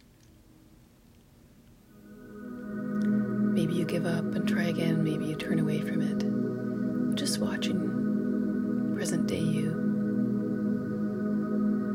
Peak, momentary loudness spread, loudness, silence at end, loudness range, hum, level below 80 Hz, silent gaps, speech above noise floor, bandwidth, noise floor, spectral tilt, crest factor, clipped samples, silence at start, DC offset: -16 dBFS; 4 LU; -29 LUFS; 0 s; 4 LU; none; -62 dBFS; none; 29 dB; 15.5 kHz; -57 dBFS; -6.5 dB/octave; 14 dB; under 0.1%; 1.95 s; under 0.1%